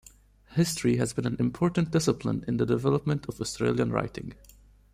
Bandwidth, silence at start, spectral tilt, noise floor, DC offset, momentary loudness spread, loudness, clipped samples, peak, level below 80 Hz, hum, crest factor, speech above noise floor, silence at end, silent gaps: 15.5 kHz; 0.5 s; -6 dB/octave; -55 dBFS; under 0.1%; 8 LU; -28 LUFS; under 0.1%; -10 dBFS; -52 dBFS; none; 18 dB; 28 dB; 0.6 s; none